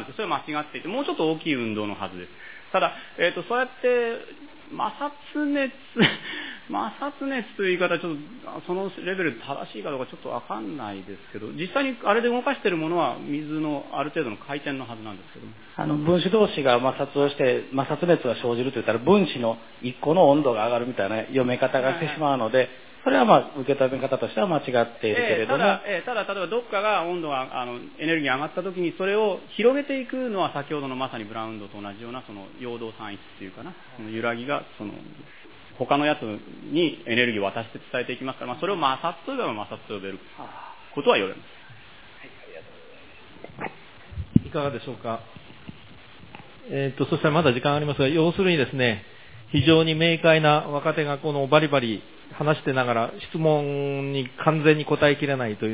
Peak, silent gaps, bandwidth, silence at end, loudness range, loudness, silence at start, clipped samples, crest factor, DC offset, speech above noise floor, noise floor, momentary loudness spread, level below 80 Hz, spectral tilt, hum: 0 dBFS; none; 4 kHz; 0 s; 9 LU; -24 LUFS; 0 s; under 0.1%; 24 dB; 0.4%; 24 dB; -48 dBFS; 18 LU; -56 dBFS; -10 dB/octave; none